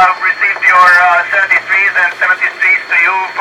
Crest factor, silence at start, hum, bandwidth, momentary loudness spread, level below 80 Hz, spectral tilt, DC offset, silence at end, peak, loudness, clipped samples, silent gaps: 10 dB; 0 s; none; 16 kHz; 6 LU; -58 dBFS; -1 dB/octave; under 0.1%; 0 s; 0 dBFS; -8 LUFS; 0.2%; none